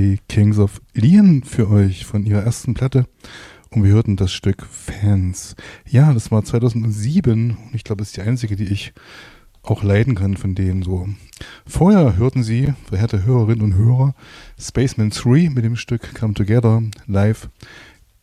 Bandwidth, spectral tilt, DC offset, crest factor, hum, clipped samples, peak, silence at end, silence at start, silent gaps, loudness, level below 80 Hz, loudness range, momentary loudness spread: 12 kHz; -7.5 dB/octave; under 0.1%; 14 dB; none; under 0.1%; -4 dBFS; 0.45 s; 0 s; none; -17 LUFS; -38 dBFS; 5 LU; 13 LU